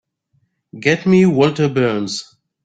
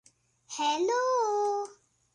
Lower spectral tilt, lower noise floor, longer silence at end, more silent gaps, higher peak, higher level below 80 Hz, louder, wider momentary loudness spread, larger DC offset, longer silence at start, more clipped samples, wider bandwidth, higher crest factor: first, -6 dB/octave vs -1 dB/octave; first, -64 dBFS vs -54 dBFS; about the same, 0.4 s vs 0.4 s; neither; first, -2 dBFS vs -16 dBFS; first, -56 dBFS vs -82 dBFS; first, -16 LUFS vs -29 LUFS; about the same, 11 LU vs 12 LU; neither; first, 0.75 s vs 0.5 s; neither; second, 9.2 kHz vs 11.5 kHz; about the same, 16 dB vs 14 dB